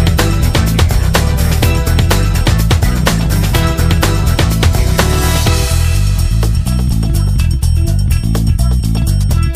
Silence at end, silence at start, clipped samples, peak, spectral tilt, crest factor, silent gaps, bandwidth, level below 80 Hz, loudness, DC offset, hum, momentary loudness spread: 0 s; 0 s; under 0.1%; 0 dBFS; -5 dB/octave; 10 dB; none; 15.5 kHz; -14 dBFS; -13 LUFS; under 0.1%; none; 2 LU